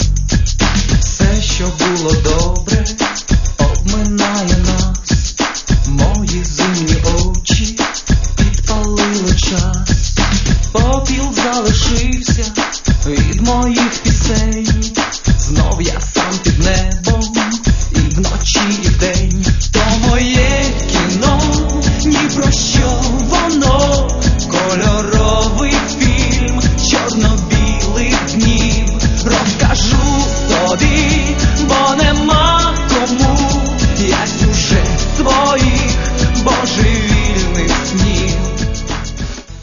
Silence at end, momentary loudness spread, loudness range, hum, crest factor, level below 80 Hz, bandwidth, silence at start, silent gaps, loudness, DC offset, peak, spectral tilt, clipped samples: 0 s; 4 LU; 2 LU; none; 12 dB; -16 dBFS; 7.4 kHz; 0 s; none; -13 LUFS; under 0.1%; 0 dBFS; -4.5 dB/octave; under 0.1%